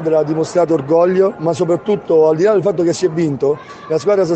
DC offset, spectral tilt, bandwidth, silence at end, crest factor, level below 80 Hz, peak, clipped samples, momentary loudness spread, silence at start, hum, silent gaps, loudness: under 0.1%; -7 dB/octave; 8.8 kHz; 0 s; 12 dB; -58 dBFS; -2 dBFS; under 0.1%; 6 LU; 0 s; none; none; -15 LUFS